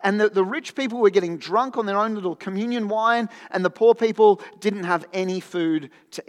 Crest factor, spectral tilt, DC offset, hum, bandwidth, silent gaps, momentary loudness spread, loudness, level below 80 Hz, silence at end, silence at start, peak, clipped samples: 16 dB; -5.5 dB/octave; under 0.1%; none; 11.5 kHz; none; 10 LU; -22 LUFS; -88 dBFS; 0.1 s; 0 s; -6 dBFS; under 0.1%